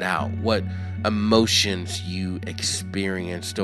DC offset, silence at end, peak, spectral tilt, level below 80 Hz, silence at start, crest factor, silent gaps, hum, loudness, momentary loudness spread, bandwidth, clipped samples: under 0.1%; 0 s; -4 dBFS; -4 dB/octave; -52 dBFS; 0 s; 20 dB; none; none; -23 LUFS; 10 LU; 14.5 kHz; under 0.1%